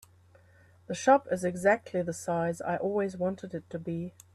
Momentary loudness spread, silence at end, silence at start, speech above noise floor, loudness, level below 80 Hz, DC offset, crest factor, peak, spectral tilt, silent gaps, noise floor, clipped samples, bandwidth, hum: 13 LU; 0.25 s; 0.9 s; 30 dB; -30 LUFS; -70 dBFS; under 0.1%; 20 dB; -10 dBFS; -6 dB/octave; none; -59 dBFS; under 0.1%; 13.5 kHz; none